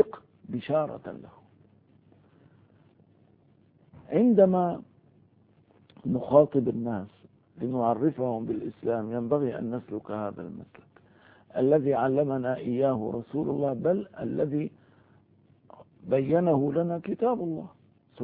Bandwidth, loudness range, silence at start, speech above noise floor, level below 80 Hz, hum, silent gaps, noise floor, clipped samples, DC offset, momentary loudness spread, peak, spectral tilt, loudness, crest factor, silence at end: 4.4 kHz; 6 LU; 0 s; 35 dB; -66 dBFS; none; none; -62 dBFS; under 0.1%; under 0.1%; 15 LU; -6 dBFS; -12 dB/octave; -27 LUFS; 22 dB; 0 s